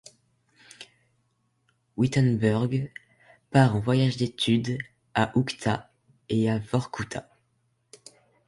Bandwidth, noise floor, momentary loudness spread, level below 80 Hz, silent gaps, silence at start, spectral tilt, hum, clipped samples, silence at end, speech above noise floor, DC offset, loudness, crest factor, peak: 11.5 kHz; -72 dBFS; 16 LU; -56 dBFS; none; 0.8 s; -6.5 dB/octave; none; under 0.1%; 1.25 s; 47 dB; under 0.1%; -26 LUFS; 20 dB; -8 dBFS